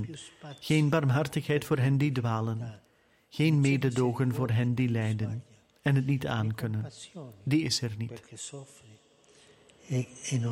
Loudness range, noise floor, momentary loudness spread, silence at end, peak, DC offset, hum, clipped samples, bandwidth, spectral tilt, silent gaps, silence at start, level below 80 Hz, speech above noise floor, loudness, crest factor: 6 LU; -60 dBFS; 16 LU; 0 s; -14 dBFS; under 0.1%; none; under 0.1%; 16.5 kHz; -6 dB/octave; none; 0 s; -62 dBFS; 32 dB; -29 LUFS; 16 dB